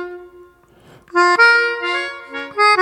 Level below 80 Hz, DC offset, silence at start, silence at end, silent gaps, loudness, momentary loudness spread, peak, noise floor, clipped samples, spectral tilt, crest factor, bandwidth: -62 dBFS; under 0.1%; 0 s; 0 s; none; -15 LUFS; 16 LU; 0 dBFS; -48 dBFS; under 0.1%; -1.5 dB/octave; 16 dB; 12 kHz